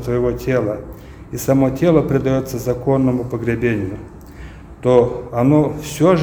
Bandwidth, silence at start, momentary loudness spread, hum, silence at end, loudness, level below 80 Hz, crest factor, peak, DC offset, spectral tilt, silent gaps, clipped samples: over 20 kHz; 0 s; 21 LU; none; 0 s; -17 LUFS; -38 dBFS; 18 dB; 0 dBFS; under 0.1%; -7.5 dB/octave; none; under 0.1%